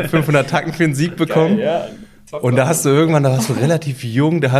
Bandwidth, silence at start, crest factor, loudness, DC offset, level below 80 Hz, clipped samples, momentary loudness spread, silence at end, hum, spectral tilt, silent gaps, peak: 15 kHz; 0 s; 14 dB; -16 LUFS; under 0.1%; -50 dBFS; under 0.1%; 7 LU; 0 s; none; -6 dB/octave; none; -2 dBFS